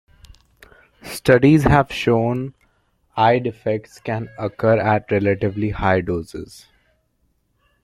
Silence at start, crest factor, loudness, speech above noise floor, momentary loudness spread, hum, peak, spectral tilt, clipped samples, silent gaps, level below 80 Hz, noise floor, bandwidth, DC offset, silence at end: 1.05 s; 20 dB; -19 LUFS; 48 dB; 18 LU; none; 0 dBFS; -7 dB/octave; under 0.1%; none; -42 dBFS; -66 dBFS; 16 kHz; under 0.1%; 1.4 s